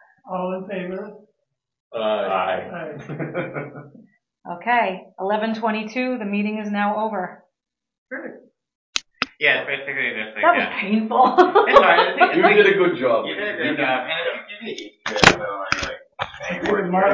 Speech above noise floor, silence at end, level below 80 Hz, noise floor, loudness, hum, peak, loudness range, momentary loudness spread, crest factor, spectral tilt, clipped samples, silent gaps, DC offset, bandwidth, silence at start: 55 dB; 0 s; -52 dBFS; -75 dBFS; -20 LUFS; none; 0 dBFS; 11 LU; 18 LU; 20 dB; -4.5 dB/octave; under 0.1%; 1.80-1.91 s, 7.98-8.06 s, 8.75-8.93 s; under 0.1%; 8 kHz; 0.25 s